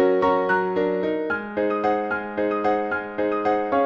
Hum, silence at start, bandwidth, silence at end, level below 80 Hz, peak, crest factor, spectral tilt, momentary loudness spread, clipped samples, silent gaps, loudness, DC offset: none; 0 s; 6.8 kHz; 0 s; -56 dBFS; -8 dBFS; 14 dB; -7.5 dB/octave; 5 LU; under 0.1%; none; -23 LUFS; under 0.1%